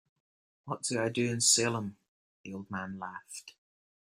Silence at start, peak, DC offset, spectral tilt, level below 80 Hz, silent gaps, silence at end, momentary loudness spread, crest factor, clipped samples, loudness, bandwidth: 0.65 s; -12 dBFS; under 0.1%; -2.5 dB/octave; -72 dBFS; 2.08-2.44 s; 0.6 s; 21 LU; 24 dB; under 0.1%; -30 LUFS; 16 kHz